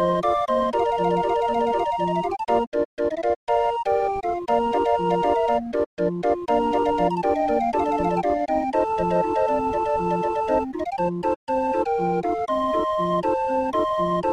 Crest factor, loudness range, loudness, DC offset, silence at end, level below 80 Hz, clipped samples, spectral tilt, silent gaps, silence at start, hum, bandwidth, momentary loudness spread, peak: 14 dB; 1 LU; -23 LUFS; under 0.1%; 0 s; -48 dBFS; under 0.1%; -7 dB/octave; 2.67-2.72 s, 2.85-2.97 s, 3.36-3.47 s, 5.86-5.97 s, 11.36-11.47 s; 0 s; none; 11 kHz; 3 LU; -8 dBFS